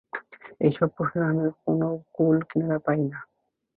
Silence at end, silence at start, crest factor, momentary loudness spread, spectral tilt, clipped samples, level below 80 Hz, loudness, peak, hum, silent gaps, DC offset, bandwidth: 0.55 s; 0.15 s; 18 dB; 8 LU; -12.5 dB/octave; under 0.1%; -66 dBFS; -25 LUFS; -8 dBFS; none; none; under 0.1%; 4.2 kHz